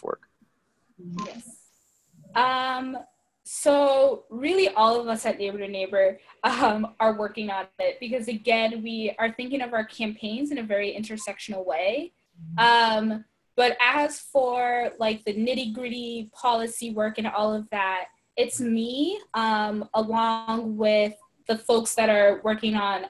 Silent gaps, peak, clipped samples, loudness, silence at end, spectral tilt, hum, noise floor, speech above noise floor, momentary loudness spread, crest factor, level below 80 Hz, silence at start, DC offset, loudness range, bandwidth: none; -6 dBFS; under 0.1%; -25 LUFS; 0 s; -3.5 dB/octave; none; -70 dBFS; 45 dB; 13 LU; 20 dB; -66 dBFS; 0.05 s; under 0.1%; 5 LU; 12.5 kHz